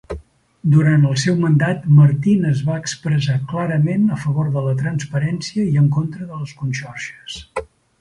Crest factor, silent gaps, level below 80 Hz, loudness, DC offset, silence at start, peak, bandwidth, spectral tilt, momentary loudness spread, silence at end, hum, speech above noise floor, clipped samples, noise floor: 16 dB; none; -48 dBFS; -17 LUFS; under 0.1%; 0.1 s; -2 dBFS; 10.5 kHz; -7 dB/octave; 16 LU; 0.35 s; none; 22 dB; under 0.1%; -39 dBFS